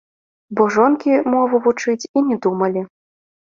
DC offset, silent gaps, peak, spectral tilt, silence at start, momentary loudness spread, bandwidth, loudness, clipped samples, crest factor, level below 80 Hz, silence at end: under 0.1%; 2.09-2.14 s; -2 dBFS; -6 dB/octave; 0.5 s; 9 LU; 7.6 kHz; -17 LUFS; under 0.1%; 16 dB; -64 dBFS; 0.65 s